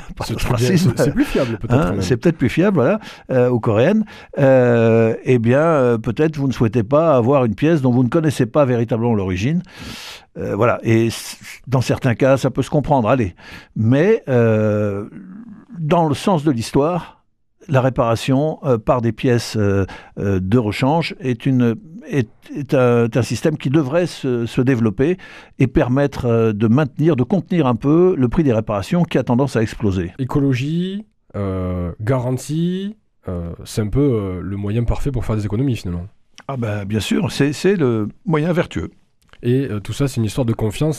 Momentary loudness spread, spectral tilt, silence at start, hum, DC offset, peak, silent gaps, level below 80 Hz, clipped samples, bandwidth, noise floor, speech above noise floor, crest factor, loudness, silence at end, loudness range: 11 LU; -7 dB/octave; 0 s; none; under 0.1%; -2 dBFS; none; -38 dBFS; under 0.1%; 14.5 kHz; -53 dBFS; 36 dB; 16 dB; -18 LUFS; 0 s; 6 LU